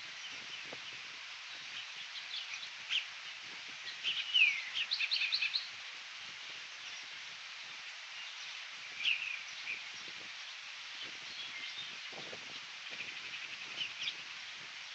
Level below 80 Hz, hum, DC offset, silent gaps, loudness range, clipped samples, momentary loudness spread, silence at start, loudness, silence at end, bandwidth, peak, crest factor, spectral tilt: under -90 dBFS; none; under 0.1%; none; 9 LU; under 0.1%; 13 LU; 0 s; -38 LUFS; 0 s; 8.4 kHz; -16 dBFS; 24 dB; 1.5 dB/octave